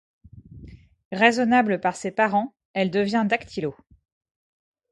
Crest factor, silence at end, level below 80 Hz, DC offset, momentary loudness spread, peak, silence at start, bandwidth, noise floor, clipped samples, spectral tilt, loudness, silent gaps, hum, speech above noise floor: 22 dB; 1.2 s; -58 dBFS; under 0.1%; 12 LU; -2 dBFS; 0.35 s; 11.5 kHz; -45 dBFS; under 0.1%; -5.5 dB/octave; -23 LUFS; 1.05-1.11 s, 2.65-2.74 s; none; 23 dB